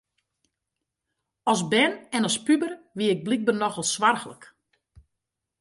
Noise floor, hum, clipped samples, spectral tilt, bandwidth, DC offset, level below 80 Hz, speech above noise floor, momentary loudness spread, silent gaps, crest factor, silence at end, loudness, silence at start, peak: -84 dBFS; none; under 0.1%; -3.5 dB/octave; 11.5 kHz; under 0.1%; -68 dBFS; 60 dB; 8 LU; none; 20 dB; 1.15 s; -24 LUFS; 1.45 s; -8 dBFS